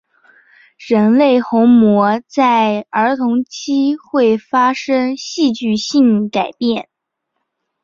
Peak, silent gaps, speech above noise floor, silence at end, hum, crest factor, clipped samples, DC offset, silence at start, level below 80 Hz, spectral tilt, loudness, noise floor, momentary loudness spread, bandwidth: -2 dBFS; none; 60 dB; 1 s; none; 14 dB; under 0.1%; under 0.1%; 0.8 s; -60 dBFS; -5.5 dB/octave; -14 LUFS; -74 dBFS; 8 LU; 7.4 kHz